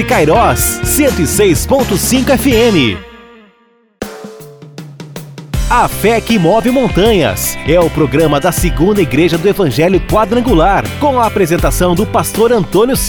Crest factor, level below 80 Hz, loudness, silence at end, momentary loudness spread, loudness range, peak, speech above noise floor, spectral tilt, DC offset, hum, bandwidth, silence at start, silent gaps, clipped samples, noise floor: 12 dB; -24 dBFS; -11 LUFS; 0 s; 16 LU; 6 LU; 0 dBFS; 41 dB; -5 dB/octave; under 0.1%; none; over 20 kHz; 0 s; none; under 0.1%; -51 dBFS